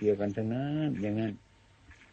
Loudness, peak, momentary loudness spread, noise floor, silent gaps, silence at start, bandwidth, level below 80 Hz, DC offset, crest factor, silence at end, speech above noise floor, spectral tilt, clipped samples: -32 LUFS; -16 dBFS; 6 LU; -58 dBFS; none; 0 s; 8 kHz; -62 dBFS; under 0.1%; 16 dB; 0.2 s; 27 dB; -8.5 dB/octave; under 0.1%